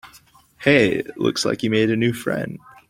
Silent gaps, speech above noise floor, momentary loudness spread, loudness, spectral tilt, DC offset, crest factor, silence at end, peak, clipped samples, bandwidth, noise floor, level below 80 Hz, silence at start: none; 32 dB; 9 LU; -20 LUFS; -5 dB/octave; under 0.1%; 20 dB; 0.35 s; -2 dBFS; under 0.1%; 16.5 kHz; -52 dBFS; -56 dBFS; 0.05 s